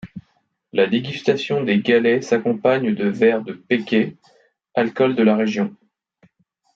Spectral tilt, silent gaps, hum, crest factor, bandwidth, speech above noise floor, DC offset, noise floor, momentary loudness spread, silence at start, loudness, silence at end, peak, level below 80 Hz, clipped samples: -6.5 dB/octave; none; none; 16 dB; 7.4 kHz; 47 dB; under 0.1%; -65 dBFS; 9 LU; 0.05 s; -19 LUFS; 1 s; -4 dBFS; -66 dBFS; under 0.1%